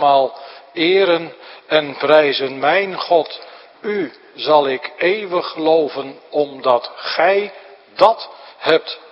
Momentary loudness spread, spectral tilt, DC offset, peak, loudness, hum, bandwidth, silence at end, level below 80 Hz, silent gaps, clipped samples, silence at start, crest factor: 15 LU; -6 dB/octave; under 0.1%; 0 dBFS; -17 LUFS; none; 6.8 kHz; 0.15 s; -68 dBFS; none; under 0.1%; 0 s; 18 dB